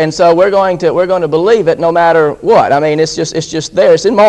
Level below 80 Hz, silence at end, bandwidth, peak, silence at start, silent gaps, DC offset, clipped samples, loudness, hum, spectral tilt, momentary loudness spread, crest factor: -44 dBFS; 0 s; 9.8 kHz; 0 dBFS; 0 s; none; under 0.1%; 0.3%; -10 LUFS; none; -5 dB/octave; 6 LU; 10 dB